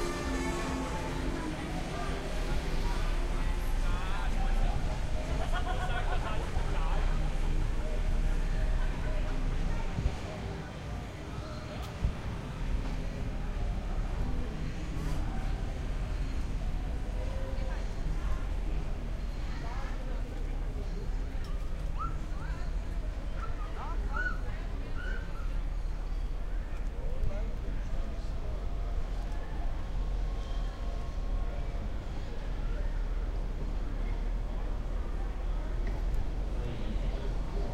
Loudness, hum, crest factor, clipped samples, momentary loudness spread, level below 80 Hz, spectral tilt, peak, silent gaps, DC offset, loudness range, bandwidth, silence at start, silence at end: -37 LUFS; none; 16 dB; under 0.1%; 5 LU; -32 dBFS; -6 dB/octave; -16 dBFS; none; under 0.1%; 4 LU; 11 kHz; 0 s; 0 s